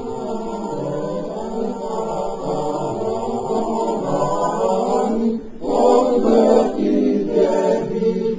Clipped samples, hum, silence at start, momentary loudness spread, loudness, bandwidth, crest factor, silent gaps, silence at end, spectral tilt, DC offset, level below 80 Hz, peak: under 0.1%; none; 0 s; 11 LU; -19 LUFS; 7.8 kHz; 16 dB; none; 0 s; -7 dB/octave; 0.7%; -48 dBFS; -2 dBFS